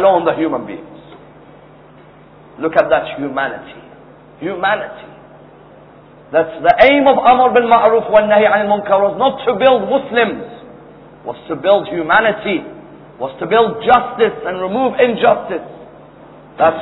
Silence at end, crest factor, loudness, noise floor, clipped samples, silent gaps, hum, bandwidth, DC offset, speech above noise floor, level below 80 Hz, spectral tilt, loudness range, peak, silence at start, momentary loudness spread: 0 s; 16 dB; -14 LUFS; -42 dBFS; under 0.1%; none; none; 5.4 kHz; under 0.1%; 28 dB; -50 dBFS; -8 dB/octave; 10 LU; 0 dBFS; 0 s; 17 LU